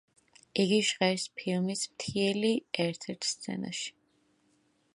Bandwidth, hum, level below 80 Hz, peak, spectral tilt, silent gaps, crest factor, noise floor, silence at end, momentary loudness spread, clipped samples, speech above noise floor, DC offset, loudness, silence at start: 11.5 kHz; none; -72 dBFS; -12 dBFS; -4 dB/octave; none; 20 dB; -71 dBFS; 1.05 s; 10 LU; under 0.1%; 40 dB; under 0.1%; -31 LUFS; 0.55 s